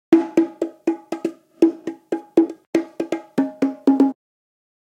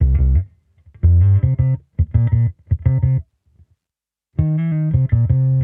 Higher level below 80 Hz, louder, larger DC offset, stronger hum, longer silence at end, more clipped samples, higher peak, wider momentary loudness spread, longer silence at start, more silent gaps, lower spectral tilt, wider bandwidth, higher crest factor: second, -70 dBFS vs -24 dBFS; second, -21 LUFS vs -18 LUFS; neither; neither; first, 0.8 s vs 0 s; neither; first, 0 dBFS vs -4 dBFS; first, 11 LU vs 7 LU; about the same, 0.1 s vs 0 s; first, 2.67-2.73 s vs none; second, -6.5 dB/octave vs -13 dB/octave; first, 9.2 kHz vs 2.4 kHz; first, 20 dB vs 14 dB